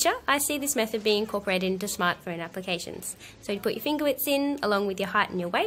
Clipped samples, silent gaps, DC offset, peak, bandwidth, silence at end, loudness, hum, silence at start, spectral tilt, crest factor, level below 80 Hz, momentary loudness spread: under 0.1%; none; under 0.1%; -8 dBFS; 16.5 kHz; 0 s; -27 LUFS; none; 0 s; -3 dB/octave; 20 dB; -60 dBFS; 10 LU